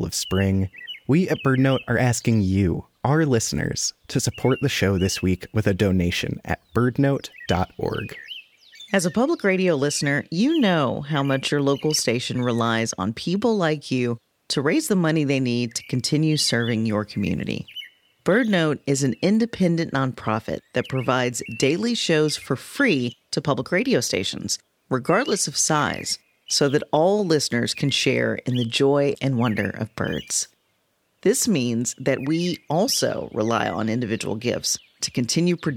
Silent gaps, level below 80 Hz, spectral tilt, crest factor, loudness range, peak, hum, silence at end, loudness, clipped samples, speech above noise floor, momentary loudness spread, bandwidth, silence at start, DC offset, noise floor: none; -52 dBFS; -4.5 dB/octave; 18 dB; 2 LU; -4 dBFS; none; 0 s; -22 LUFS; under 0.1%; 47 dB; 7 LU; 18 kHz; 0 s; under 0.1%; -69 dBFS